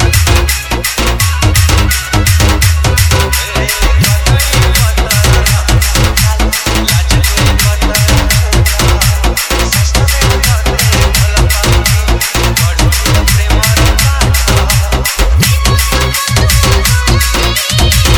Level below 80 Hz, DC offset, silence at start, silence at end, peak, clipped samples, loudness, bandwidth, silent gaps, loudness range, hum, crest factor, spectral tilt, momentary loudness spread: -14 dBFS; under 0.1%; 0 s; 0 s; 0 dBFS; 0.8%; -9 LUFS; over 20 kHz; none; 0 LU; none; 8 dB; -3.5 dB/octave; 3 LU